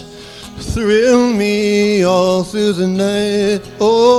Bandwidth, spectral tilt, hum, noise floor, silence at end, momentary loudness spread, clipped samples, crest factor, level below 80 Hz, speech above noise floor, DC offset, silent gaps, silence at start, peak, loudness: 14 kHz; -5 dB/octave; none; -33 dBFS; 0 s; 13 LU; under 0.1%; 14 dB; -38 dBFS; 20 dB; under 0.1%; none; 0 s; 0 dBFS; -14 LUFS